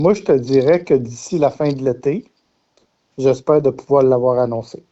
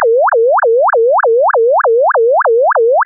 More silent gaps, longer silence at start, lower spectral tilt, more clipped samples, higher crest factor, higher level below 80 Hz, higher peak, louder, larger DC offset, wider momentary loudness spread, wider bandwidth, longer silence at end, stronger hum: neither; about the same, 0 s vs 0 s; first, -7.5 dB/octave vs 11.5 dB/octave; neither; first, 14 dB vs 4 dB; first, -54 dBFS vs under -90 dBFS; first, -2 dBFS vs -6 dBFS; second, -17 LUFS vs -10 LUFS; neither; first, 7 LU vs 0 LU; first, 8.2 kHz vs 2 kHz; first, 0.25 s vs 0 s; neither